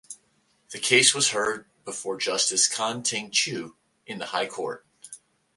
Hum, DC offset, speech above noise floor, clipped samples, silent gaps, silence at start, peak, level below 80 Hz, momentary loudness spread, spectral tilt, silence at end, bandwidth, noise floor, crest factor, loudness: none; under 0.1%; 41 dB; under 0.1%; none; 0.1 s; -2 dBFS; -72 dBFS; 25 LU; -0.5 dB/octave; 0.4 s; 12 kHz; -67 dBFS; 26 dB; -23 LUFS